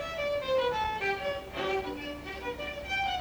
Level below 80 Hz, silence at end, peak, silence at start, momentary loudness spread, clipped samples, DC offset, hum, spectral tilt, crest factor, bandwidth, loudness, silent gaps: -52 dBFS; 0 s; -18 dBFS; 0 s; 9 LU; under 0.1%; under 0.1%; none; -4 dB/octave; 16 dB; over 20 kHz; -32 LUFS; none